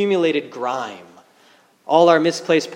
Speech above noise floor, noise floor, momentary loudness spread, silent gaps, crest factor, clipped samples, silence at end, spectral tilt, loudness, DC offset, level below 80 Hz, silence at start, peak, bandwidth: 36 dB; -54 dBFS; 12 LU; none; 18 dB; under 0.1%; 0 s; -5 dB/octave; -18 LUFS; under 0.1%; -78 dBFS; 0 s; 0 dBFS; 11.5 kHz